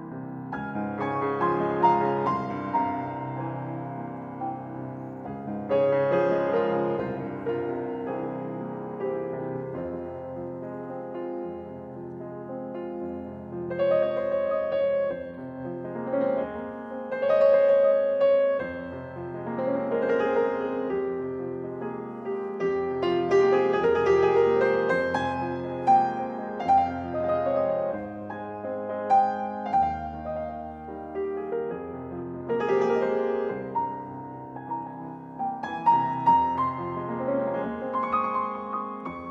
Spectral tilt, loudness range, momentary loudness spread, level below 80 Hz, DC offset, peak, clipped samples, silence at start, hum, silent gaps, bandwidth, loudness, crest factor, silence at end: -8 dB/octave; 9 LU; 14 LU; -58 dBFS; under 0.1%; -8 dBFS; under 0.1%; 0 s; none; none; 7.2 kHz; -27 LUFS; 18 dB; 0 s